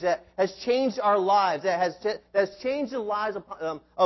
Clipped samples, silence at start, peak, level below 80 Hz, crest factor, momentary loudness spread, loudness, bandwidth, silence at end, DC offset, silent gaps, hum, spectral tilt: under 0.1%; 0 s; -10 dBFS; -66 dBFS; 16 dB; 10 LU; -26 LUFS; 6.2 kHz; 0 s; under 0.1%; none; none; -5 dB/octave